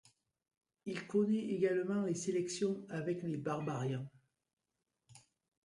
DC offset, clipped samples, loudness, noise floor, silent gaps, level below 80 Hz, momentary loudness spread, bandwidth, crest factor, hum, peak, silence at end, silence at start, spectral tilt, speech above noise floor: under 0.1%; under 0.1%; -37 LUFS; -88 dBFS; 4.53-4.57 s; -80 dBFS; 10 LU; 11.5 kHz; 16 dB; none; -22 dBFS; 0.45 s; 0.85 s; -6 dB/octave; 52 dB